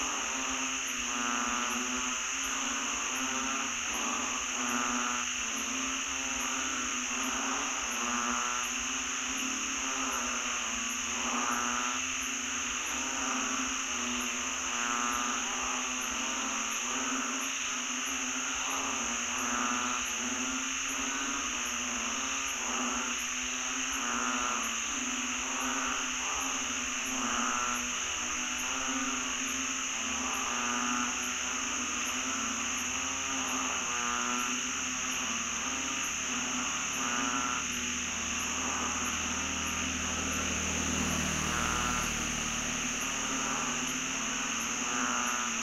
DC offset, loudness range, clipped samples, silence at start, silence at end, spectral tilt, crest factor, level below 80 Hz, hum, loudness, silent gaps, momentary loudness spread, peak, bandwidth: under 0.1%; 1 LU; under 0.1%; 0 s; 0 s; -0.5 dB/octave; 18 dB; -54 dBFS; none; -31 LUFS; none; 2 LU; -16 dBFS; 16 kHz